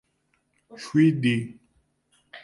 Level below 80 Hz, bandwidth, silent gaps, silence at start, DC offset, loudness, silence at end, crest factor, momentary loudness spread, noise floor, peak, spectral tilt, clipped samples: -68 dBFS; 11.5 kHz; none; 0.75 s; under 0.1%; -23 LUFS; 0.05 s; 18 dB; 20 LU; -71 dBFS; -8 dBFS; -7 dB/octave; under 0.1%